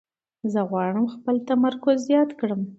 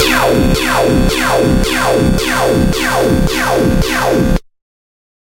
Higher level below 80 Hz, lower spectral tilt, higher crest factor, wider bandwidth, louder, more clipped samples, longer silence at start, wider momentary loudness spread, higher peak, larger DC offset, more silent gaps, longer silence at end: second, -72 dBFS vs -22 dBFS; first, -7 dB/octave vs -5 dB/octave; about the same, 16 dB vs 12 dB; second, 8 kHz vs 16.5 kHz; second, -23 LUFS vs -12 LUFS; neither; first, 0.45 s vs 0 s; first, 7 LU vs 2 LU; second, -8 dBFS vs 0 dBFS; neither; neither; second, 0.05 s vs 0.85 s